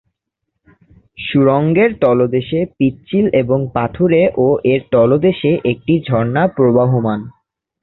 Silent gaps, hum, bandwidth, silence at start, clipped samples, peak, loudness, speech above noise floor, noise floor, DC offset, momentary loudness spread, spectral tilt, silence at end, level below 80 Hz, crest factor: none; none; 4.2 kHz; 1.2 s; under 0.1%; -2 dBFS; -14 LUFS; 62 dB; -75 dBFS; under 0.1%; 6 LU; -11.5 dB/octave; 0.5 s; -46 dBFS; 14 dB